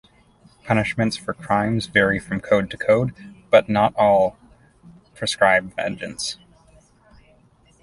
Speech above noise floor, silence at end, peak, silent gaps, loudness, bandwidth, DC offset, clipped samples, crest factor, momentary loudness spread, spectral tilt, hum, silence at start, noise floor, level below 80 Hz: 36 dB; 1.5 s; -2 dBFS; none; -20 LUFS; 11.5 kHz; under 0.1%; under 0.1%; 20 dB; 11 LU; -5 dB/octave; none; 0.65 s; -56 dBFS; -50 dBFS